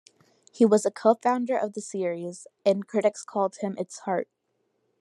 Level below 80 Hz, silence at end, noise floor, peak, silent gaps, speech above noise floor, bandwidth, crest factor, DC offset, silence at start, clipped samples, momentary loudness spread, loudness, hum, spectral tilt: -86 dBFS; 0.8 s; -74 dBFS; -6 dBFS; none; 49 dB; 12 kHz; 20 dB; under 0.1%; 0.55 s; under 0.1%; 11 LU; -26 LUFS; none; -5.5 dB/octave